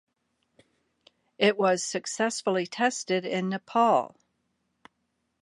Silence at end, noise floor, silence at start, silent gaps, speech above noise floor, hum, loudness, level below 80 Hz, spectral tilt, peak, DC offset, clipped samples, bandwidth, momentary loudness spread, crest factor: 1.35 s; -77 dBFS; 1.4 s; none; 51 dB; none; -26 LUFS; -82 dBFS; -3.5 dB/octave; -8 dBFS; under 0.1%; under 0.1%; 11.5 kHz; 7 LU; 20 dB